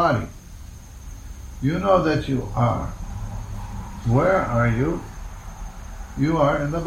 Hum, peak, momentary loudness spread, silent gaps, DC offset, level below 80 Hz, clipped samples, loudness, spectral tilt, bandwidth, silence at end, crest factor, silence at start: none; -4 dBFS; 21 LU; none; under 0.1%; -36 dBFS; under 0.1%; -22 LUFS; -7.5 dB/octave; 15 kHz; 0 s; 18 dB; 0 s